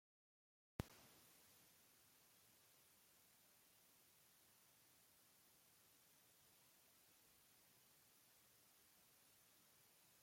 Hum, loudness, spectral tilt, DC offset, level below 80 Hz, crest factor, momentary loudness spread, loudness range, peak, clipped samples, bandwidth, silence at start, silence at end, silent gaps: none; -60 LUFS; -4 dB/octave; under 0.1%; -78 dBFS; 38 dB; 13 LU; 3 LU; -30 dBFS; under 0.1%; 16.5 kHz; 0.8 s; 0 s; none